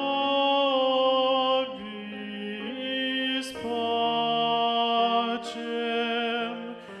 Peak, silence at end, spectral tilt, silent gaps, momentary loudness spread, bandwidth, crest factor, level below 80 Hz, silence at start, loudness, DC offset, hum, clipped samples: -12 dBFS; 0 s; -4 dB/octave; none; 12 LU; 12 kHz; 14 dB; -72 dBFS; 0 s; -26 LUFS; under 0.1%; none; under 0.1%